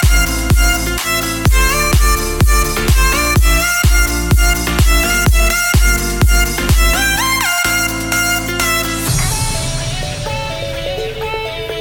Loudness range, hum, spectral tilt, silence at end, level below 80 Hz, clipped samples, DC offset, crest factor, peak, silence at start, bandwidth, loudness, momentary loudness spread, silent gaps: 4 LU; none; -3.5 dB/octave; 0 s; -16 dBFS; under 0.1%; under 0.1%; 12 dB; -2 dBFS; 0 s; 19.5 kHz; -14 LUFS; 8 LU; none